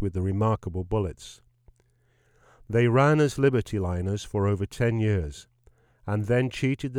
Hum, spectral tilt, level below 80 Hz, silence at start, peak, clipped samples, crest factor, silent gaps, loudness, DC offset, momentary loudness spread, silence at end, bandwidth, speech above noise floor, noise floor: none; -7 dB/octave; -46 dBFS; 0 s; -8 dBFS; under 0.1%; 18 dB; none; -26 LUFS; under 0.1%; 13 LU; 0 s; 12.5 kHz; 40 dB; -65 dBFS